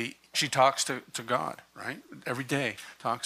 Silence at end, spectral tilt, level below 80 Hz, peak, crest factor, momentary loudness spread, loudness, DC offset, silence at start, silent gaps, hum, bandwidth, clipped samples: 0 s; -3 dB/octave; -74 dBFS; -10 dBFS; 22 dB; 15 LU; -30 LUFS; under 0.1%; 0 s; none; none; 15 kHz; under 0.1%